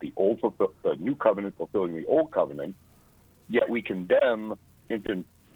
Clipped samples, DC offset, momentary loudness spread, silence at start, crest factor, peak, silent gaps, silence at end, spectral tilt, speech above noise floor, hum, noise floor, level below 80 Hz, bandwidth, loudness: under 0.1%; under 0.1%; 12 LU; 0 s; 20 dB; -8 dBFS; none; 0.3 s; -7.5 dB/octave; 32 dB; none; -58 dBFS; -64 dBFS; 19.5 kHz; -27 LUFS